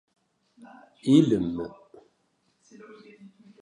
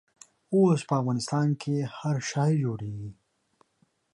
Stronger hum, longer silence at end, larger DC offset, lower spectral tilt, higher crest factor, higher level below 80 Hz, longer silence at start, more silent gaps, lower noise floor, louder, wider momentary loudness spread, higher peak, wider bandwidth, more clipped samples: neither; second, 0.35 s vs 1 s; neither; about the same, -7.5 dB/octave vs -6.5 dB/octave; first, 22 dB vs 16 dB; about the same, -60 dBFS vs -64 dBFS; first, 1.05 s vs 0.5 s; neither; about the same, -71 dBFS vs -70 dBFS; first, -24 LUFS vs -27 LUFS; first, 16 LU vs 13 LU; first, -6 dBFS vs -12 dBFS; about the same, 10.5 kHz vs 11.5 kHz; neither